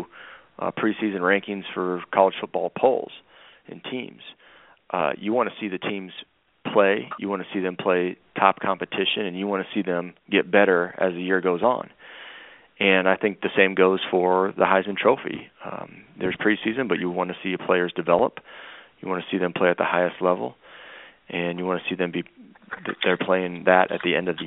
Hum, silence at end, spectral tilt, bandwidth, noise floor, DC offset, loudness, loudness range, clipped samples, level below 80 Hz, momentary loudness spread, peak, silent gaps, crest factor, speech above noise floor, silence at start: none; 0 s; -3 dB/octave; 4 kHz; -47 dBFS; under 0.1%; -23 LUFS; 6 LU; under 0.1%; -68 dBFS; 19 LU; 0 dBFS; none; 24 dB; 23 dB; 0 s